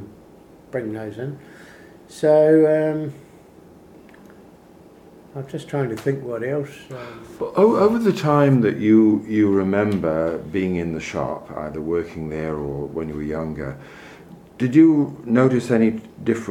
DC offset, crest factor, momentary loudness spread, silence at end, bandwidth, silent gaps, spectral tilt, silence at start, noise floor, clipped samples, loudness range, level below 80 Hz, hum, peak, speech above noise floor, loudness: under 0.1%; 18 dB; 18 LU; 0 s; 12 kHz; none; -8 dB/octave; 0 s; -47 dBFS; under 0.1%; 11 LU; -50 dBFS; none; -2 dBFS; 27 dB; -20 LUFS